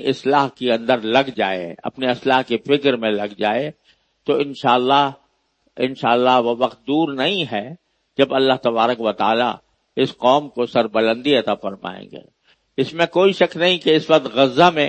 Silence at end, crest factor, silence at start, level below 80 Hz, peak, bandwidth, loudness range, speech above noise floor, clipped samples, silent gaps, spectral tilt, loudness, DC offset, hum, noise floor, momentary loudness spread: 0 s; 18 dB; 0 s; -66 dBFS; 0 dBFS; 8.6 kHz; 2 LU; 47 dB; under 0.1%; none; -5.5 dB/octave; -18 LUFS; under 0.1%; none; -65 dBFS; 11 LU